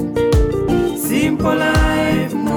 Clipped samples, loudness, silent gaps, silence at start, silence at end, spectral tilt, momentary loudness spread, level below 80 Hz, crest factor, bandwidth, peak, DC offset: under 0.1%; -16 LUFS; none; 0 s; 0 s; -6 dB/octave; 3 LU; -24 dBFS; 10 dB; over 20 kHz; -6 dBFS; under 0.1%